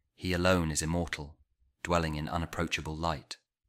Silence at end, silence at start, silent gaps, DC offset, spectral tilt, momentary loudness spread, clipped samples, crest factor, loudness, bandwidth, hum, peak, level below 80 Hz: 0.35 s; 0.2 s; none; under 0.1%; -4.5 dB/octave; 13 LU; under 0.1%; 20 dB; -32 LUFS; 16 kHz; none; -12 dBFS; -46 dBFS